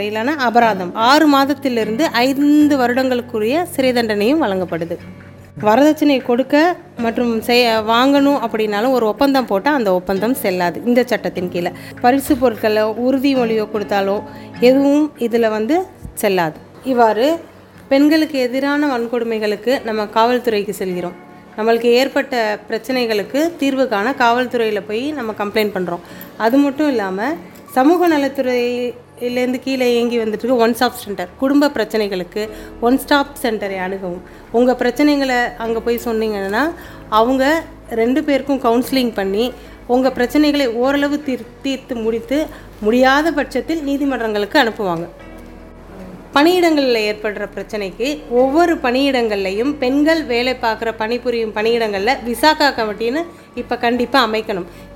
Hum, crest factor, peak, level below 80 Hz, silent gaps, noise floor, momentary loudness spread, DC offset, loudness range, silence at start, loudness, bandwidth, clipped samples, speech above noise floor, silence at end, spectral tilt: none; 16 dB; 0 dBFS; -46 dBFS; none; -36 dBFS; 10 LU; under 0.1%; 3 LU; 0 s; -16 LUFS; 17 kHz; under 0.1%; 20 dB; 0 s; -4.5 dB/octave